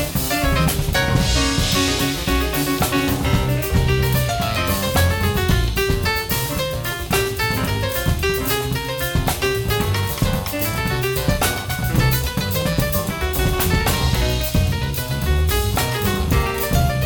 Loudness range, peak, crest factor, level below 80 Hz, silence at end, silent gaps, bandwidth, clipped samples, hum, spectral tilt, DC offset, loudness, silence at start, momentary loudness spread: 2 LU; -4 dBFS; 14 dB; -26 dBFS; 0 s; none; 19.5 kHz; under 0.1%; none; -4.5 dB/octave; under 0.1%; -19 LUFS; 0 s; 3 LU